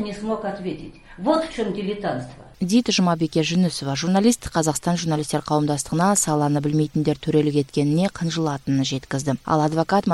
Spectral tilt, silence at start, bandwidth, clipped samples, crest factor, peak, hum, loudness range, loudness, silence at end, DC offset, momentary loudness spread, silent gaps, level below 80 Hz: -5 dB/octave; 0 s; 13 kHz; under 0.1%; 16 dB; -6 dBFS; none; 2 LU; -22 LUFS; 0 s; under 0.1%; 8 LU; none; -48 dBFS